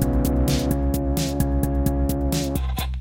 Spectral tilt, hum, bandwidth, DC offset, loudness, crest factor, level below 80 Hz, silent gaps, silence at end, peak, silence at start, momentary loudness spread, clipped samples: -6 dB/octave; none; 17 kHz; under 0.1%; -23 LUFS; 16 dB; -26 dBFS; none; 0 s; -6 dBFS; 0 s; 3 LU; under 0.1%